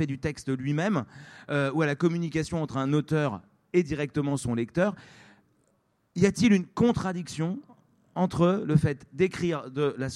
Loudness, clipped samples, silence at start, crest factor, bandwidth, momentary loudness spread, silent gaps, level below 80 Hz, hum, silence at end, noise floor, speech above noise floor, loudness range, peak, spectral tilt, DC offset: -27 LUFS; under 0.1%; 0 s; 18 dB; 12 kHz; 9 LU; none; -54 dBFS; none; 0 s; -70 dBFS; 44 dB; 3 LU; -8 dBFS; -6.5 dB/octave; under 0.1%